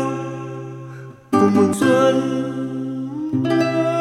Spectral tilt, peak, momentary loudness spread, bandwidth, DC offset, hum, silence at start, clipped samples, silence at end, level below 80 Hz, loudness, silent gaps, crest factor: -6.5 dB/octave; -2 dBFS; 17 LU; 14.5 kHz; under 0.1%; none; 0 s; under 0.1%; 0 s; -60 dBFS; -19 LUFS; none; 18 dB